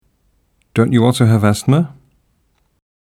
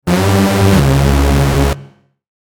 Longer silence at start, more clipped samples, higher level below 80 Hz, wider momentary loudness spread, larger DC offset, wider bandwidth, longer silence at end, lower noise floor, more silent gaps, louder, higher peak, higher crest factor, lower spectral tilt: first, 0.75 s vs 0.05 s; neither; second, -52 dBFS vs -18 dBFS; first, 8 LU vs 5 LU; neither; second, 14.5 kHz vs 19.5 kHz; first, 1.1 s vs 0.55 s; first, -61 dBFS vs -40 dBFS; neither; about the same, -14 LUFS vs -12 LUFS; about the same, 0 dBFS vs 0 dBFS; about the same, 16 dB vs 12 dB; about the same, -7 dB/octave vs -6 dB/octave